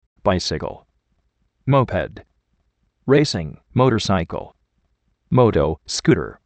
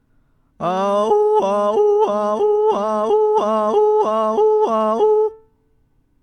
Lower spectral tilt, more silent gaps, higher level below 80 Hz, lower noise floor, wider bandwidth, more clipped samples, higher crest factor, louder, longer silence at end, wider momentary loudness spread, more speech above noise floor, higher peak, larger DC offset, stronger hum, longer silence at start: about the same, -6 dB/octave vs -6 dB/octave; neither; first, -42 dBFS vs -60 dBFS; first, -67 dBFS vs -59 dBFS; about the same, 8.8 kHz vs 8.8 kHz; neither; first, 20 dB vs 12 dB; second, -20 LUFS vs -17 LUFS; second, 0.15 s vs 0.85 s; first, 13 LU vs 3 LU; first, 49 dB vs 43 dB; first, 0 dBFS vs -6 dBFS; neither; neither; second, 0.25 s vs 0.6 s